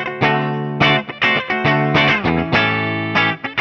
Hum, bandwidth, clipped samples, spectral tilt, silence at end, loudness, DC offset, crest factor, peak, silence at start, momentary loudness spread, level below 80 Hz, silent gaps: none; 6.8 kHz; under 0.1%; -6.5 dB/octave; 0 s; -16 LUFS; under 0.1%; 16 dB; -2 dBFS; 0 s; 4 LU; -44 dBFS; none